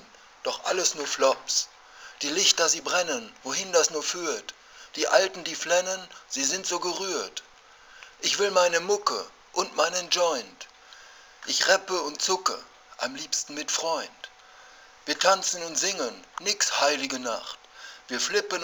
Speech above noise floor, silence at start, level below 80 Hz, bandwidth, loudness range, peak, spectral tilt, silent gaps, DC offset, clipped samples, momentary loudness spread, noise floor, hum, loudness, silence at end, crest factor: 25 dB; 0 s; -72 dBFS; over 20 kHz; 3 LU; -4 dBFS; 0 dB/octave; none; under 0.1%; under 0.1%; 17 LU; -52 dBFS; none; -26 LUFS; 0 s; 24 dB